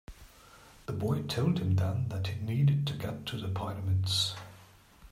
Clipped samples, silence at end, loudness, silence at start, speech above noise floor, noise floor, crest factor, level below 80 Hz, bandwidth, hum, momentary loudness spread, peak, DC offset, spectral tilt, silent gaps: under 0.1%; 0 s; -31 LUFS; 0.1 s; 26 dB; -56 dBFS; 14 dB; -58 dBFS; 15.5 kHz; none; 9 LU; -18 dBFS; under 0.1%; -6 dB/octave; none